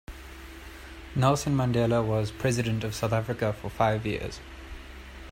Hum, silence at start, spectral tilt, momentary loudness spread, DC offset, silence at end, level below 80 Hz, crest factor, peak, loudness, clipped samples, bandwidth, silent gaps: none; 0.1 s; -6 dB/octave; 19 LU; under 0.1%; 0 s; -46 dBFS; 20 dB; -8 dBFS; -27 LUFS; under 0.1%; 16 kHz; none